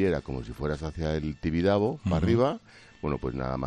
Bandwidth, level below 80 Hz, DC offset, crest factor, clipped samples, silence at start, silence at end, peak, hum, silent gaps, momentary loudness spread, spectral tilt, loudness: 10.5 kHz; -44 dBFS; under 0.1%; 18 dB; under 0.1%; 0 s; 0 s; -10 dBFS; none; none; 9 LU; -8 dB/octave; -29 LUFS